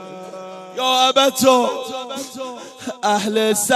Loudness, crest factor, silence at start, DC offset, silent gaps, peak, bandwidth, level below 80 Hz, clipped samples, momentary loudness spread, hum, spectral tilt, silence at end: -17 LUFS; 18 dB; 0 s; under 0.1%; none; 0 dBFS; 16 kHz; -66 dBFS; under 0.1%; 19 LU; none; -2 dB/octave; 0 s